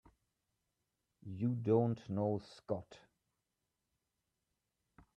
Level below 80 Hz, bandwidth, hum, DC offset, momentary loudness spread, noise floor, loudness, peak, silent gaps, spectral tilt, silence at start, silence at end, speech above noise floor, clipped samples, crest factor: -76 dBFS; 8.8 kHz; none; under 0.1%; 12 LU; -88 dBFS; -37 LUFS; -20 dBFS; none; -9.5 dB/octave; 1.25 s; 2.2 s; 51 dB; under 0.1%; 20 dB